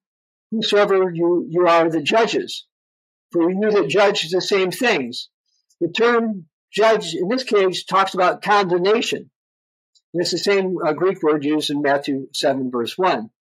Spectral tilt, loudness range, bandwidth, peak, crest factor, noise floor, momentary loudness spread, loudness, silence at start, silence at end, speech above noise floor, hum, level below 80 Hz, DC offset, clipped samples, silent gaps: -4.5 dB/octave; 2 LU; 15.5 kHz; -6 dBFS; 14 dB; under -90 dBFS; 10 LU; -19 LUFS; 0.5 s; 0.1 s; over 72 dB; none; -76 dBFS; under 0.1%; under 0.1%; 2.72-3.29 s, 5.34-5.44 s, 6.53-6.68 s, 9.36-9.93 s, 10.03-10.13 s